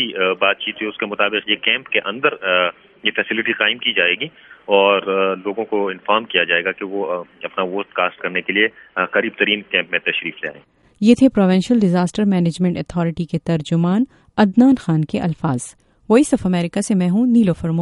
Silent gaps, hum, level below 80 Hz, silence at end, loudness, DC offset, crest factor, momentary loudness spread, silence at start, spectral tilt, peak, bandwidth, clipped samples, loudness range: none; none; -52 dBFS; 0 s; -18 LUFS; under 0.1%; 18 dB; 9 LU; 0 s; -5.5 dB/octave; 0 dBFS; 11.5 kHz; under 0.1%; 3 LU